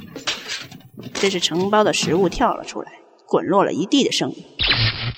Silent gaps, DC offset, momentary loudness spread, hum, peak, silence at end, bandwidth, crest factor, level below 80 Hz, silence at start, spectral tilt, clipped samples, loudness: none; under 0.1%; 15 LU; none; -4 dBFS; 0 s; over 20 kHz; 18 dB; -42 dBFS; 0 s; -4 dB/octave; under 0.1%; -19 LUFS